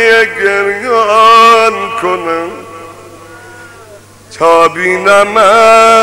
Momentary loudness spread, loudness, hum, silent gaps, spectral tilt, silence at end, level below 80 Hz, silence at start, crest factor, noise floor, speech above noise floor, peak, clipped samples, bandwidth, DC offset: 12 LU; -7 LUFS; none; none; -2.5 dB/octave; 0 s; -48 dBFS; 0 s; 8 dB; -35 dBFS; 28 dB; 0 dBFS; 0.3%; 16.5 kHz; under 0.1%